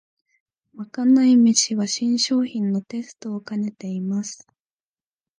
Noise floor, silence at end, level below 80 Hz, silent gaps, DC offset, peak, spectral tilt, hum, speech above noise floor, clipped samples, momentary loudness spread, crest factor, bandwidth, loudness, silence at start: under -90 dBFS; 1.05 s; -74 dBFS; none; under 0.1%; -2 dBFS; -4 dB/octave; none; over 69 dB; under 0.1%; 18 LU; 20 dB; 10 kHz; -20 LUFS; 0.75 s